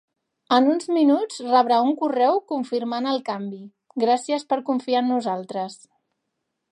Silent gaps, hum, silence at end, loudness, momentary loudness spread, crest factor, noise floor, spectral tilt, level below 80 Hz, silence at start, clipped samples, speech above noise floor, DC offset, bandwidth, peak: none; none; 0.95 s; -22 LUFS; 12 LU; 18 dB; -79 dBFS; -5 dB/octave; -82 dBFS; 0.5 s; under 0.1%; 57 dB; under 0.1%; 11.5 kHz; -4 dBFS